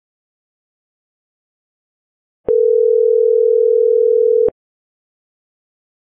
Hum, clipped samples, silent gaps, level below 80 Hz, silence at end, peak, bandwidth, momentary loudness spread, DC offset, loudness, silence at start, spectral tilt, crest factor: none; under 0.1%; none; -58 dBFS; 1.55 s; -6 dBFS; 1.4 kHz; 5 LU; under 0.1%; -13 LUFS; 2.5 s; -9.5 dB/octave; 10 dB